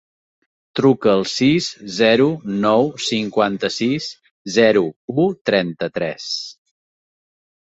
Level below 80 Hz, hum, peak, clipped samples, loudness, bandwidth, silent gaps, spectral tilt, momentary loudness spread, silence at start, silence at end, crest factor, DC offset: -58 dBFS; none; -2 dBFS; under 0.1%; -18 LUFS; 8.2 kHz; 4.31-4.45 s, 4.96-5.08 s, 5.41-5.45 s; -5 dB/octave; 11 LU; 0.75 s; 1.2 s; 18 dB; under 0.1%